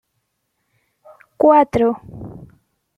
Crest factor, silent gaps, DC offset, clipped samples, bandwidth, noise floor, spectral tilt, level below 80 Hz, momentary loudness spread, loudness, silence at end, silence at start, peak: 18 dB; none; under 0.1%; under 0.1%; 11.5 kHz; -72 dBFS; -8 dB/octave; -50 dBFS; 23 LU; -15 LUFS; 0.5 s; 1.4 s; -2 dBFS